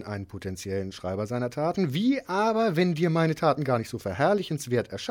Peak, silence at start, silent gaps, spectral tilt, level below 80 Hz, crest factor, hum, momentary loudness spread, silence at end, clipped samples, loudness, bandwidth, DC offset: -10 dBFS; 0 s; none; -6.5 dB/octave; -60 dBFS; 16 dB; none; 9 LU; 0 s; under 0.1%; -27 LUFS; 17 kHz; under 0.1%